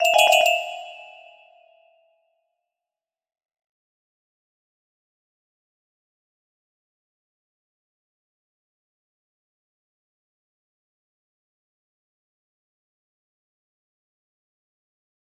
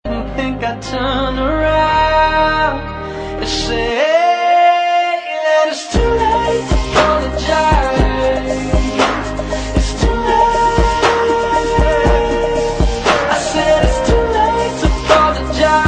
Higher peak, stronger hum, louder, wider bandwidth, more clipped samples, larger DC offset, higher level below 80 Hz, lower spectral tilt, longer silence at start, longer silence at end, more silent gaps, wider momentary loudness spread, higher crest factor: second, -4 dBFS vs 0 dBFS; neither; second, -17 LUFS vs -14 LUFS; first, 15.5 kHz vs 9.6 kHz; neither; neither; second, -82 dBFS vs -22 dBFS; second, 2.5 dB/octave vs -5 dB/octave; about the same, 0 s vs 0.05 s; first, 14.3 s vs 0 s; neither; first, 25 LU vs 7 LU; first, 28 dB vs 14 dB